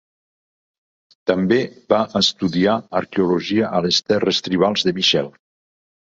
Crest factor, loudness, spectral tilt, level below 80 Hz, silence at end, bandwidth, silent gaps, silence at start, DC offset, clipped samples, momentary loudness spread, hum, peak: 18 dB; -18 LUFS; -4.5 dB/octave; -54 dBFS; 0.75 s; 7.8 kHz; none; 1.25 s; under 0.1%; under 0.1%; 5 LU; none; -2 dBFS